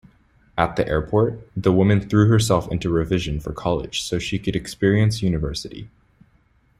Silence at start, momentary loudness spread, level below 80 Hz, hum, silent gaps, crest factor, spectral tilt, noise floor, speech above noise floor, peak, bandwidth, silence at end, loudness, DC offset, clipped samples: 0.55 s; 10 LU; -40 dBFS; none; none; 20 dB; -6 dB/octave; -59 dBFS; 39 dB; -2 dBFS; 15 kHz; 0.9 s; -21 LUFS; under 0.1%; under 0.1%